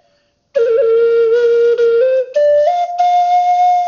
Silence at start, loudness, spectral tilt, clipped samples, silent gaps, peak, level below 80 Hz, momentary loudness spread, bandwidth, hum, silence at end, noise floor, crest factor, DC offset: 0.55 s; -12 LUFS; 0.5 dB/octave; under 0.1%; none; -4 dBFS; -64 dBFS; 3 LU; 7 kHz; none; 0 s; -59 dBFS; 8 dB; under 0.1%